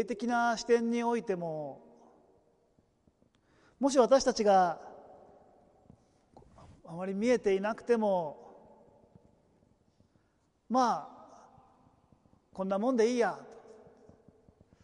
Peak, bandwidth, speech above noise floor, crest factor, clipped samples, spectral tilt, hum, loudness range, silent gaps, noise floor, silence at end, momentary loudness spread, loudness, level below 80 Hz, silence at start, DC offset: -14 dBFS; 11 kHz; 44 dB; 20 dB; under 0.1%; -5 dB/octave; none; 7 LU; none; -73 dBFS; 1.25 s; 20 LU; -30 LUFS; -68 dBFS; 0 s; under 0.1%